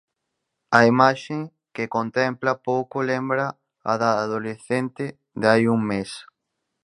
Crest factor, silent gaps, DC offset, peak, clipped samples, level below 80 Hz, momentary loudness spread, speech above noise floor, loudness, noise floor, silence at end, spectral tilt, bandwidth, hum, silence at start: 22 dB; none; under 0.1%; 0 dBFS; under 0.1%; -64 dBFS; 14 LU; 58 dB; -22 LUFS; -79 dBFS; 0.65 s; -6 dB/octave; 11 kHz; none; 0.7 s